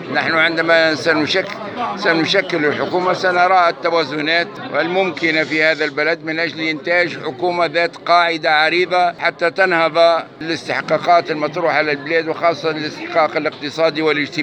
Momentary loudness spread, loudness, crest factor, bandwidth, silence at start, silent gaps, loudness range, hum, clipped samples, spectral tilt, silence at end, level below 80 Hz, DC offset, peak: 7 LU; -16 LUFS; 16 dB; 9.2 kHz; 0 s; none; 2 LU; none; under 0.1%; -4.5 dB/octave; 0 s; -68 dBFS; under 0.1%; 0 dBFS